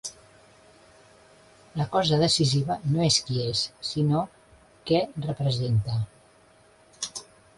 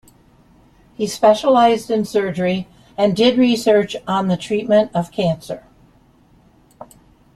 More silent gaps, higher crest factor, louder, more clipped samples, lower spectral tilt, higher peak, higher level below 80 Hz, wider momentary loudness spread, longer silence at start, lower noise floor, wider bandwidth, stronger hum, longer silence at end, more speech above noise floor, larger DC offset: neither; about the same, 18 dB vs 16 dB; second, -26 LUFS vs -17 LUFS; neither; about the same, -5 dB/octave vs -5.5 dB/octave; second, -8 dBFS vs -2 dBFS; about the same, -54 dBFS vs -54 dBFS; first, 16 LU vs 12 LU; second, 0.05 s vs 1 s; first, -57 dBFS vs -52 dBFS; second, 11.5 kHz vs 14 kHz; neither; second, 0.35 s vs 0.5 s; about the same, 33 dB vs 36 dB; neither